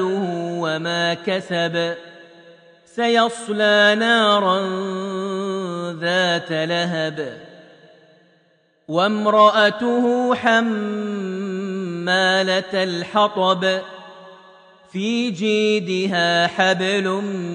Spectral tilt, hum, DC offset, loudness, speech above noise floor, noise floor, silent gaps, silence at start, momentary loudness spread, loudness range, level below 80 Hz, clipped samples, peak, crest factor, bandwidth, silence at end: -4.5 dB/octave; none; under 0.1%; -19 LUFS; 41 dB; -60 dBFS; none; 0 s; 11 LU; 5 LU; -72 dBFS; under 0.1%; -2 dBFS; 18 dB; 10 kHz; 0 s